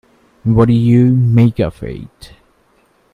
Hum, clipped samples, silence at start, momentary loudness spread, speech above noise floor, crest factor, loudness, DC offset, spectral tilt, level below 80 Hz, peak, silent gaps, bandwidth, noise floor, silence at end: none; under 0.1%; 0.45 s; 17 LU; 43 dB; 14 dB; -12 LUFS; under 0.1%; -10 dB/octave; -38 dBFS; 0 dBFS; none; 4.9 kHz; -55 dBFS; 0.9 s